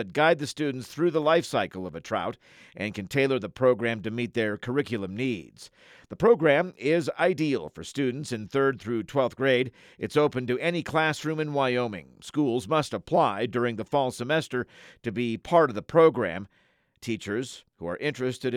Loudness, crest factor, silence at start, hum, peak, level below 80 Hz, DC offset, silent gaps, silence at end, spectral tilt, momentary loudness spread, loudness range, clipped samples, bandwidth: -26 LUFS; 18 dB; 0 s; none; -8 dBFS; -64 dBFS; under 0.1%; none; 0 s; -6 dB/octave; 12 LU; 2 LU; under 0.1%; 14.5 kHz